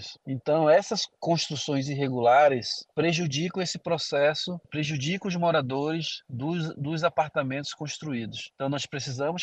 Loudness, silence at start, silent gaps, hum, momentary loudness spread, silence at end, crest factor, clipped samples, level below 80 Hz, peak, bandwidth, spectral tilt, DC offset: -27 LUFS; 0 s; none; none; 12 LU; 0 s; 18 dB; under 0.1%; -68 dBFS; -10 dBFS; 8.8 kHz; -5 dB/octave; under 0.1%